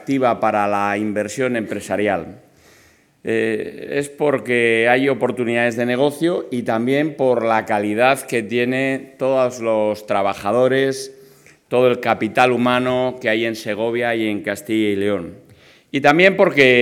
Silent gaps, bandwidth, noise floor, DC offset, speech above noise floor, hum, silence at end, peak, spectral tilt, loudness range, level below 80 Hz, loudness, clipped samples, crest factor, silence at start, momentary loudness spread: none; 17 kHz; -53 dBFS; under 0.1%; 35 dB; none; 0 s; 0 dBFS; -5 dB/octave; 4 LU; -64 dBFS; -18 LUFS; under 0.1%; 18 dB; 0 s; 8 LU